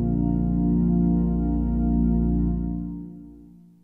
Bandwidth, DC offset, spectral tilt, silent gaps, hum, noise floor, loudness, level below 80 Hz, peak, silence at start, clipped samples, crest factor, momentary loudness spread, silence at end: 1.8 kHz; under 0.1%; -14 dB/octave; none; none; -48 dBFS; -23 LUFS; -30 dBFS; -12 dBFS; 0 s; under 0.1%; 10 dB; 13 LU; 0.4 s